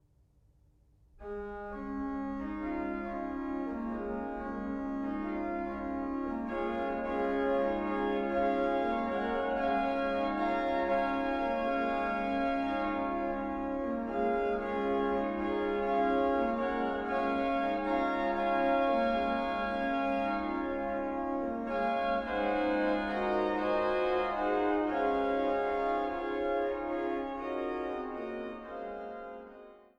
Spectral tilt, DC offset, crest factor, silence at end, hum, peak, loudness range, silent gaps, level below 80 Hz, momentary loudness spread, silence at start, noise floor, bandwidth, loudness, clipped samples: -7 dB/octave; under 0.1%; 14 dB; 0.2 s; none; -18 dBFS; 6 LU; none; -54 dBFS; 7 LU; 1.2 s; -66 dBFS; 8.2 kHz; -32 LUFS; under 0.1%